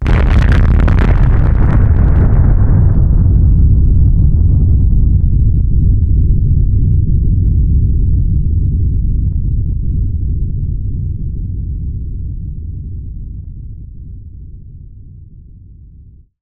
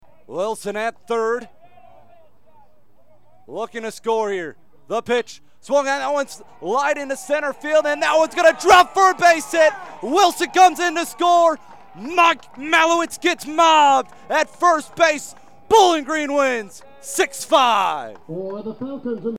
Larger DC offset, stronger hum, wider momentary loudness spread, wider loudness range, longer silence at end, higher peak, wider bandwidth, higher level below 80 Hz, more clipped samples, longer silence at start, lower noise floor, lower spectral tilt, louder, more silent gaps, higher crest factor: second, under 0.1% vs 0.6%; neither; about the same, 16 LU vs 16 LU; first, 17 LU vs 13 LU; first, 0.85 s vs 0 s; about the same, 0 dBFS vs -2 dBFS; second, 4.5 kHz vs 17.5 kHz; first, -12 dBFS vs -60 dBFS; neither; second, 0 s vs 0.3 s; second, -39 dBFS vs -58 dBFS; first, -10 dB/octave vs -2 dB/octave; first, -13 LUFS vs -18 LUFS; neither; second, 10 dB vs 16 dB